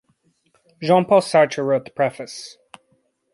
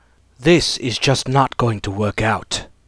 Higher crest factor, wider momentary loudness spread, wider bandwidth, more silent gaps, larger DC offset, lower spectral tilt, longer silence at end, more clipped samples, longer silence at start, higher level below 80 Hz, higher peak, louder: about the same, 18 dB vs 16 dB; first, 18 LU vs 7 LU; about the same, 11.5 kHz vs 11 kHz; neither; neither; about the same, -5.5 dB/octave vs -4.5 dB/octave; first, 0.85 s vs 0.2 s; neither; first, 0.8 s vs 0.4 s; second, -68 dBFS vs -40 dBFS; about the same, -2 dBFS vs -2 dBFS; about the same, -18 LUFS vs -18 LUFS